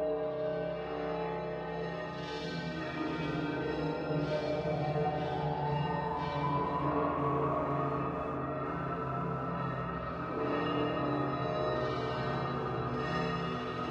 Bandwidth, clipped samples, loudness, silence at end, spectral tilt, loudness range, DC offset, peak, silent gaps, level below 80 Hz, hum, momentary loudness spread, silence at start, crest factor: 8 kHz; under 0.1%; -34 LUFS; 0 s; -8 dB/octave; 3 LU; under 0.1%; -18 dBFS; none; -54 dBFS; none; 5 LU; 0 s; 16 dB